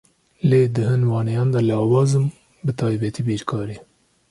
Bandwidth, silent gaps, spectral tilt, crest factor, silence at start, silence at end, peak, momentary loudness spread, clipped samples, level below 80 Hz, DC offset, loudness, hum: 11.5 kHz; none; -8 dB/octave; 16 dB; 0.45 s; 0.5 s; -4 dBFS; 10 LU; under 0.1%; -54 dBFS; under 0.1%; -20 LUFS; none